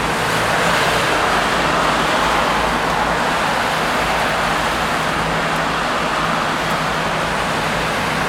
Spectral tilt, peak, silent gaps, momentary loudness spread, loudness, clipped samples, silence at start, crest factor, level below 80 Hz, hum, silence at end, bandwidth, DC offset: -3.5 dB/octave; -2 dBFS; none; 3 LU; -17 LUFS; under 0.1%; 0 s; 16 dB; -36 dBFS; none; 0 s; 17 kHz; under 0.1%